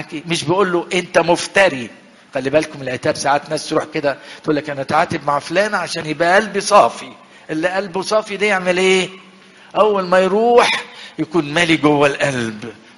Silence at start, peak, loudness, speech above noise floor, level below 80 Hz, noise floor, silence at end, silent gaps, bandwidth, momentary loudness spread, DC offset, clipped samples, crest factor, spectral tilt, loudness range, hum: 0 s; 0 dBFS; -16 LUFS; 27 dB; -54 dBFS; -44 dBFS; 0.25 s; none; 11.5 kHz; 12 LU; under 0.1%; under 0.1%; 16 dB; -4 dB/octave; 4 LU; none